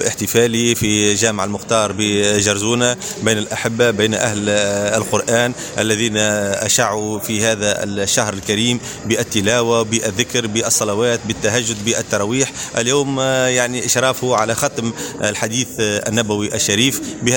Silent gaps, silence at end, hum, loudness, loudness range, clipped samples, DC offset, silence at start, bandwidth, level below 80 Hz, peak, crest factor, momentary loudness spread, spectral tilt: none; 0 s; none; -16 LUFS; 1 LU; under 0.1%; under 0.1%; 0 s; 17 kHz; -48 dBFS; 0 dBFS; 18 dB; 5 LU; -3 dB/octave